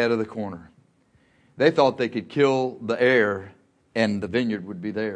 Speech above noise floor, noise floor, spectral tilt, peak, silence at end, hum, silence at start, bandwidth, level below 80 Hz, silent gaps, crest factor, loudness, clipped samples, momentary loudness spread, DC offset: 39 dB; -62 dBFS; -6 dB/octave; -4 dBFS; 0 s; none; 0 s; 9.8 kHz; -64 dBFS; none; 20 dB; -23 LUFS; under 0.1%; 13 LU; under 0.1%